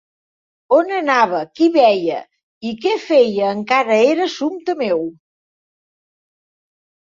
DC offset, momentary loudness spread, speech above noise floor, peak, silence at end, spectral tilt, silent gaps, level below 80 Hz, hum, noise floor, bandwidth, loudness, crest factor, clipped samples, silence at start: under 0.1%; 10 LU; over 74 dB; -2 dBFS; 1.9 s; -5 dB/octave; 2.43-2.61 s; -66 dBFS; none; under -90 dBFS; 7.6 kHz; -16 LUFS; 16 dB; under 0.1%; 0.7 s